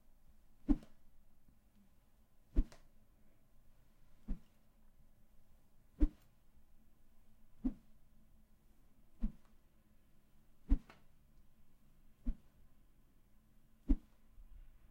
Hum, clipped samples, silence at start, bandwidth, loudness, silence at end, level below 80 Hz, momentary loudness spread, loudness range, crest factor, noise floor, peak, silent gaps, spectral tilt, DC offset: none; under 0.1%; 0.7 s; 4.2 kHz; -44 LUFS; 0.3 s; -46 dBFS; 19 LU; 6 LU; 26 dB; -66 dBFS; -18 dBFS; none; -9 dB/octave; under 0.1%